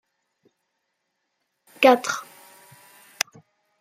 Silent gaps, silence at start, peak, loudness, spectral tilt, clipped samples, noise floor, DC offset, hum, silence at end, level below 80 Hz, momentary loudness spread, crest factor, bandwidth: none; 1.8 s; -2 dBFS; -22 LUFS; -2 dB/octave; under 0.1%; -77 dBFS; under 0.1%; none; 1.6 s; -80 dBFS; 12 LU; 24 dB; 16 kHz